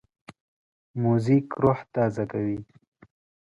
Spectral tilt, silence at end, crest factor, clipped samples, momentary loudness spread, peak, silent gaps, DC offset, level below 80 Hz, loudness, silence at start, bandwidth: -9.5 dB/octave; 0.9 s; 18 dB; under 0.1%; 10 LU; -8 dBFS; 0.40-0.94 s; under 0.1%; -58 dBFS; -25 LUFS; 0.3 s; 11 kHz